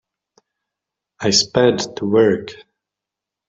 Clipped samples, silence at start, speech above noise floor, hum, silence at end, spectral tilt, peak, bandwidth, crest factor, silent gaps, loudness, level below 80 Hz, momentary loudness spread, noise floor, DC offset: under 0.1%; 1.2 s; 69 dB; none; 0.95 s; -3.5 dB/octave; -2 dBFS; 8.2 kHz; 18 dB; none; -16 LUFS; -56 dBFS; 10 LU; -85 dBFS; under 0.1%